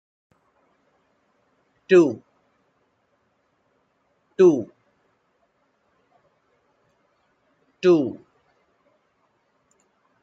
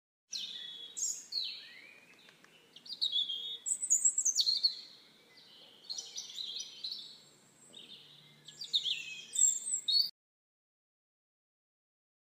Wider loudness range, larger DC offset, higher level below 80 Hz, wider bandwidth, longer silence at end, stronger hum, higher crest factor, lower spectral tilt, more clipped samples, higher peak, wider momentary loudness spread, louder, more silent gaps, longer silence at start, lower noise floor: second, 5 LU vs 12 LU; neither; first, -76 dBFS vs under -90 dBFS; second, 7.8 kHz vs 15.5 kHz; second, 2.05 s vs 2.25 s; neither; about the same, 22 dB vs 22 dB; first, -7 dB/octave vs 3.5 dB/octave; neither; first, -4 dBFS vs -16 dBFS; about the same, 22 LU vs 24 LU; first, -19 LUFS vs -32 LUFS; neither; first, 1.9 s vs 0.3 s; first, -69 dBFS vs -62 dBFS